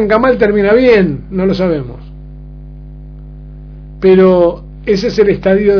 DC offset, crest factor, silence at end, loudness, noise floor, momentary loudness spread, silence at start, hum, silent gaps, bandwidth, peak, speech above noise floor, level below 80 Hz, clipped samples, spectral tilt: under 0.1%; 12 dB; 0 s; -11 LUFS; -29 dBFS; 13 LU; 0 s; 50 Hz at -30 dBFS; none; 5.4 kHz; 0 dBFS; 20 dB; -32 dBFS; 0.4%; -8 dB/octave